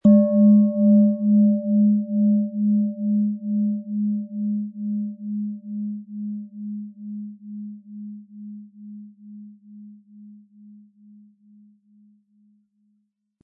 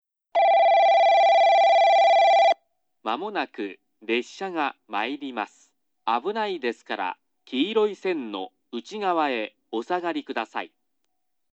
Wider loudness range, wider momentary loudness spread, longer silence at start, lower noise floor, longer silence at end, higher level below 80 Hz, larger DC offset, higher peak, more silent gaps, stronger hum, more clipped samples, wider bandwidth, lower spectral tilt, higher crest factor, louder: first, 24 LU vs 11 LU; first, 24 LU vs 18 LU; second, 0.05 s vs 0.35 s; second, -70 dBFS vs -79 dBFS; first, 3.1 s vs 0.85 s; first, -72 dBFS vs under -90 dBFS; neither; first, -6 dBFS vs -10 dBFS; neither; neither; neither; second, 1.2 kHz vs 7.8 kHz; first, -14 dB/octave vs -3.5 dB/octave; about the same, 16 dB vs 14 dB; about the same, -21 LUFS vs -22 LUFS